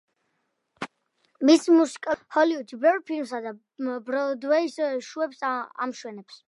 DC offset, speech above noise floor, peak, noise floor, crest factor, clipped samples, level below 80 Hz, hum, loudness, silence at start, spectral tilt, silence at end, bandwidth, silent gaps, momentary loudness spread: under 0.1%; 51 dB; -6 dBFS; -76 dBFS; 18 dB; under 0.1%; -76 dBFS; none; -25 LUFS; 0.8 s; -3.5 dB/octave; 0.15 s; 11.5 kHz; none; 19 LU